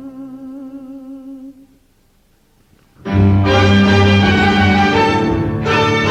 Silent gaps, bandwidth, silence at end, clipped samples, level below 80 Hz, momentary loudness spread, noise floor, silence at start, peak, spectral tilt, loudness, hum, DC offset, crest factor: none; 8.4 kHz; 0 s; under 0.1%; -36 dBFS; 22 LU; -54 dBFS; 0 s; -2 dBFS; -6.5 dB/octave; -12 LUFS; none; under 0.1%; 14 dB